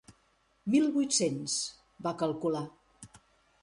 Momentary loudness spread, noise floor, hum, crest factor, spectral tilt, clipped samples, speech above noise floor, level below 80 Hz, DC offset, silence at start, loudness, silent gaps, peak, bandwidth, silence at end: 12 LU; -70 dBFS; none; 18 dB; -4 dB/octave; under 0.1%; 40 dB; -70 dBFS; under 0.1%; 0.1 s; -31 LUFS; none; -14 dBFS; 11.5 kHz; 0.45 s